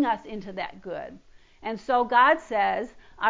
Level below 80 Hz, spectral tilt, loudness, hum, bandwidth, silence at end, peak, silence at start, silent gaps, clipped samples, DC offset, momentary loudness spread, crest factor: -60 dBFS; -5 dB/octave; -24 LUFS; none; 7.6 kHz; 0 s; -8 dBFS; 0 s; none; under 0.1%; under 0.1%; 18 LU; 18 dB